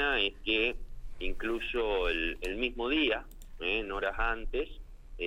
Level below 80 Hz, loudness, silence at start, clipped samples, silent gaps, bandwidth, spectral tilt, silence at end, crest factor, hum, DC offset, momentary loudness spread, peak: -40 dBFS; -32 LUFS; 0 s; under 0.1%; none; 13.5 kHz; -4.5 dB/octave; 0 s; 18 dB; none; under 0.1%; 10 LU; -16 dBFS